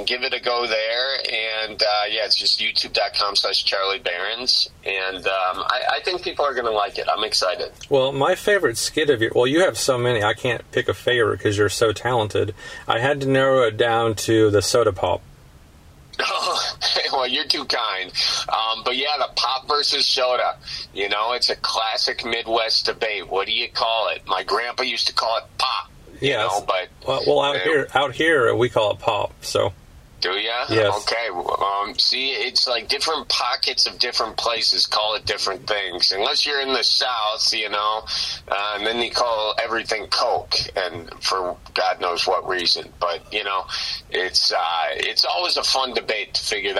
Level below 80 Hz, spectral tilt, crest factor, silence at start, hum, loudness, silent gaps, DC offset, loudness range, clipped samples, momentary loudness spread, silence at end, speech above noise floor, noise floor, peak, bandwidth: -52 dBFS; -3 dB/octave; 22 dB; 0 s; none; -20 LUFS; none; under 0.1%; 3 LU; under 0.1%; 6 LU; 0 s; 26 dB; -47 dBFS; 0 dBFS; 16 kHz